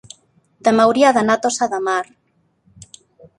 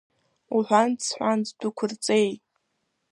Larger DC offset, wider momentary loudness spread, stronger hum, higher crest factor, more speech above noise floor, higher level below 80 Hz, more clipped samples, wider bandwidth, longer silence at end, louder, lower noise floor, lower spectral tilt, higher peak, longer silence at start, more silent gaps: neither; about the same, 9 LU vs 8 LU; neither; about the same, 18 dB vs 20 dB; second, 46 dB vs 52 dB; first, -60 dBFS vs -76 dBFS; neither; about the same, 11.5 kHz vs 11.5 kHz; first, 1.35 s vs 0.75 s; first, -16 LUFS vs -25 LUFS; second, -62 dBFS vs -76 dBFS; about the same, -3.5 dB/octave vs -4 dB/octave; first, -2 dBFS vs -6 dBFS; first, 0.65 s vs 0.5 s; neither